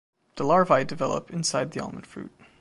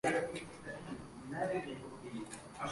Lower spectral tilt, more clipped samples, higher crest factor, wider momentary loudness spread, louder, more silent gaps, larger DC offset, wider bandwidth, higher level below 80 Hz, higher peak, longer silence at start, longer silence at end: about the same, -4.5 dB/octave vs -5 dB/octave; neither; about the same, 20 dB vs 18 dB; first, 21 LU vs 10 LU; first, -25 LUFS vs -42 LUFS; neither; neither; about the same, 11.5 kHz vs 11.5 kHz; about the same, -62 dBFS vs -66 dBFS; first, -6 dBFS vs -22 dBFS; first, 0.35 s vs 0.05 s; first, 0.3 s vs 0 s